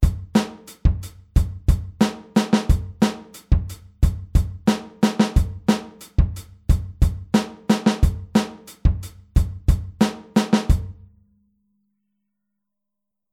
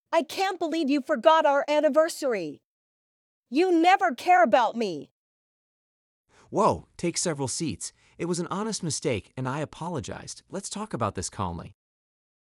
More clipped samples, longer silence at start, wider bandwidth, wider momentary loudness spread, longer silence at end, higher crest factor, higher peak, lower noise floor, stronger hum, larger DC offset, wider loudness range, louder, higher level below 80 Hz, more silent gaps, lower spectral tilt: neither; about the same, 0 s vs 0.1 s; about the same, 15.5 kHz vs 16 kHz; second, 5 LU vs 15 LU; first, 2.4 s vs 0.7 s; about the same, 18 dB vs 22 dB; about the same, -4 dBFS vs -4 dBFS; second, -85 dBFS vs under -90 dBFS; neither; neither; second, 2 LU vs 8 LU; first, -22 LUFS vs -25 LUFS; first, -24 dBFS vs -62 dBFS; second, none vs 2.65-3.43 s, 5.11-6.24 s; first, -6.5 dB/octave vs -4.5 dB/octave